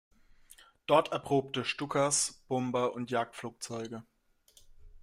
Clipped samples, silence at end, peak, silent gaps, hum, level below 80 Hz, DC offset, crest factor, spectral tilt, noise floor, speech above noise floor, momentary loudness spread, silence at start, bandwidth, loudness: under 0.1%; 0.05 s; -12 dBFS; none; none; -64 dBFS; under 0.1%; 22 dB; -3.5 dB/octave; -65 dBFS; 34 dB; 14 LU; 0.9 s; 16 kHz; -32 LUFS